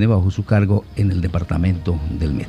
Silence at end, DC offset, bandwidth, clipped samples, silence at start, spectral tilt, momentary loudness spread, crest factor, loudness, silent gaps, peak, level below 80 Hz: 0 s; under 0.1%; 9 kHz; under 0.1%; 0 s; -9 dB/octave; 5 LU; 14 dB; -19 LUFS; none; -4 dBFS; -30 dBFS